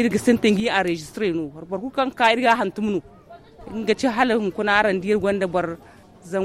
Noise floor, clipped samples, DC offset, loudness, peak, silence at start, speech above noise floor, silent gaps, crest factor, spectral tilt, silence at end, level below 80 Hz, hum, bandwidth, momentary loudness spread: -45 dBFS; under 0.1%; under 0.1%; -21 LUFS; -2 dBFS; 0 s; 24 dB; none; 18 dB; -5 dB/octave; 0 s; -52 dBFS; none; 14.5 kHz; 11 LU